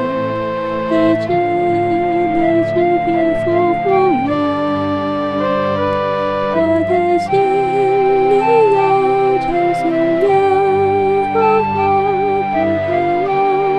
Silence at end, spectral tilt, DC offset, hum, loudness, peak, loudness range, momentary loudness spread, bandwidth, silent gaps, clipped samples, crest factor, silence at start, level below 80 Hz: 0 s; -7.5 dB/octave; under 0.1%; none; -15 LUFS; -2 dBFS; 3 LU; 5 LU; 9.4 kHz; none; under 0.1%; 12 dB; 0 s; -44 dBFS